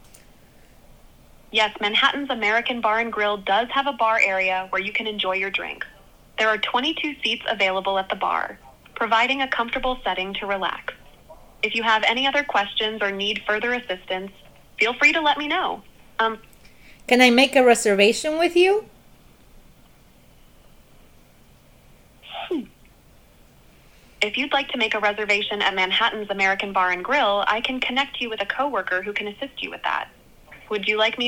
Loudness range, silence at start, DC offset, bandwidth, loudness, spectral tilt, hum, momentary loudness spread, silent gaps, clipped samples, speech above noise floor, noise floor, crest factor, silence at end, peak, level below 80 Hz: 8 LU; 1.55 s; under 0.1%; 19.5 kHz; -21 LUFS; -2.5 dB/octave; none; 13 LU; none; under 0.1%; 30 dB; -52 dBFS; 22 dB; 0 s; -2 dBFS; -52 dBFS